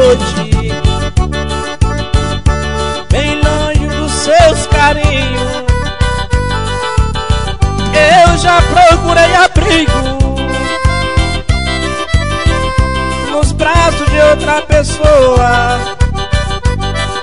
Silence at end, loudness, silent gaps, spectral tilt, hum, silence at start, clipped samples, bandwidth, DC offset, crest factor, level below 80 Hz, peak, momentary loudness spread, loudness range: 0 s; -11 LUFS; none; -5 dB/octave; none; 0 s; 0.1%; 11 kHz; 4%; 10 dB; -16 dBFS; 0 dBFS; 8 LU; 5 LU